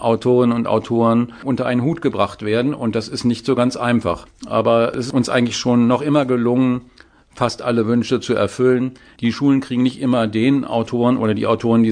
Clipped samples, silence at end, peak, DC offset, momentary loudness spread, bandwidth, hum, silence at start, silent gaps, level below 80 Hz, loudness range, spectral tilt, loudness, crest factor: under 0.1%; 0 s; -2 dBFS; under 0.1%; 6 LU; 10 kHz; none; 0 s; none; -52 dBFS; 2 LU; -6.5 dB/octave; -18 LUFS; 16 dB